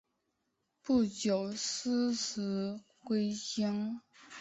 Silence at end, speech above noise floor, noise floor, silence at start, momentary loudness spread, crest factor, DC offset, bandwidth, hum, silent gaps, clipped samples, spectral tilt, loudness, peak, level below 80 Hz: 0 s; 48 dB; -82 dBFS; 0.85 s; 12 LU; 16 dB; under 0.1%; 8.2 kHz; none; none; under 0.1%; -4.5 dB/octave; -34 LUFS; -20 dBFS; -70 dBFS